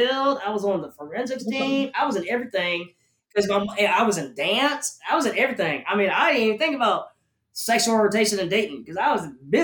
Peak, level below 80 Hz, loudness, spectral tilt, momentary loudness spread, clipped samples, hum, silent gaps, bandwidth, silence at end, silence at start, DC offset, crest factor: -8 dBFS; -68 dBFS; -23 LUFS; -3 dB/octave; 10 LU; under 0.1%; none; none; 18 kHz; 0 s; 0 s; under 0.1%; 16 dB